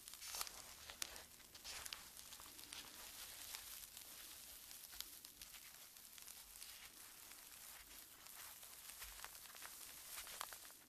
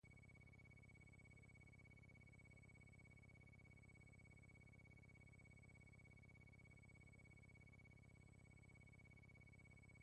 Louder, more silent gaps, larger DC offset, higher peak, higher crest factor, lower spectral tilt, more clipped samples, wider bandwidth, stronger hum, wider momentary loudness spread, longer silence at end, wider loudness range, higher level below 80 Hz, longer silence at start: first, -53 LUFS vs -67 LUFS; neither; neither; first, -18 dBFS vs -56 dBFS; first, 38 dB vs 10 dB; second, 0.5 dB/octave vs -6 dB/octave; neither; first, 14.5 kHz vs 10 kHz; second, none vs 50 Hz at -75 dBFS; first, 7 LU vs 1 LU; about the same, 0 s vs 0 s; first, 4 LU vs 0 LU; about the same, -76 dBFS vs -74 dBFS; about the same, 0 s vs 0.05 s